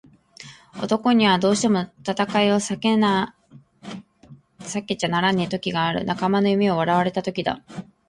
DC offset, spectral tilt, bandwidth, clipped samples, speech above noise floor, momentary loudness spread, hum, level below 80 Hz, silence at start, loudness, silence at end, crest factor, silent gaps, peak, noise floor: under 0.1%; -5 dB/octave; 11.5 kHz; under 0.1%; 28 dB; 20 LU; none; -58 dBFS; 0.4 s; -21 LUFS; 0.25 s; 16 dB; none; -6 dBFS; -49 dBFS